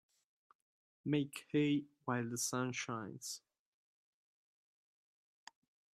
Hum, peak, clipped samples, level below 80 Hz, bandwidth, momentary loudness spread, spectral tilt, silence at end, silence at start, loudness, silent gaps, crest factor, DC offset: none; -22 dBFS; under 0.1%; -84 dBFS; 15 kHz; 11 LU; -4.5 dB/octave; 2.55 s; 1.05 s; -39 LUFS; none; 20 dB; under 0.1%